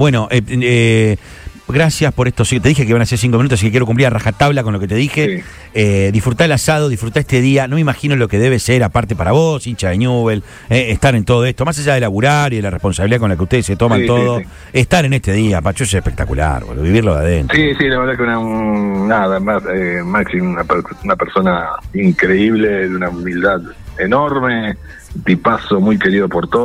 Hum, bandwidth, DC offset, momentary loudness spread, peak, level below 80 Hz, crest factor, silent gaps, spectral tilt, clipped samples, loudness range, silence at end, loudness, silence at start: none; 15.5 kHz; under 0.1%; 6 LU; 0 dBFS; -30 dBFS; 14 dB; none; -6 dB/octave; under 0.1%; 2 LU; 0 s; -14 LUFS; 0 s